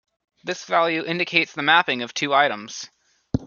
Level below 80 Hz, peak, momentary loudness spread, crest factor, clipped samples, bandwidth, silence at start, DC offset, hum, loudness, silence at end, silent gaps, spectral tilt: -52 dBFS; -2 dBFS; 17 LU; 22 dB; under 0.1%; 7.2 kHz; 0.45 s; under 0.1%; none; -21 LUFS; 0 s; none; -3.5 dB/octave